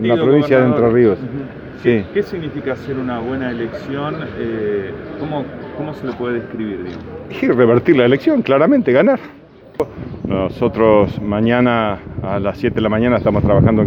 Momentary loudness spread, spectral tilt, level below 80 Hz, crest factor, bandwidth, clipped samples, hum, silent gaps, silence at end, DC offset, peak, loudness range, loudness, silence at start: 14 LU; -9 dB/octave; -40 dBFS; 16 dB; 6.6 kHz; under 0.1%; none; none; 0 s; under 0.1%; 0 dBFS; 8 LU; -16 LUFS; 0 s